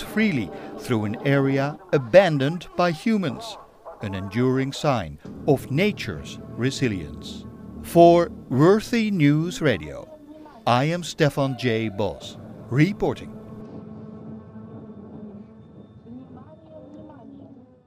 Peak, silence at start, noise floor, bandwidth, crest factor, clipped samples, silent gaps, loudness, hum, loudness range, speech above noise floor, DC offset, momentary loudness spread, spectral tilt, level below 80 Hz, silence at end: -2 dBFS; 0 s; -46 dBFS; 16 kHz; 22 dB; under 0.1%; none; -22 LUFS; none; 20 LU; 25 dB; under 0.1%; 23 LU; -6.5 dB/octave; -52 dBFS; 0.25 s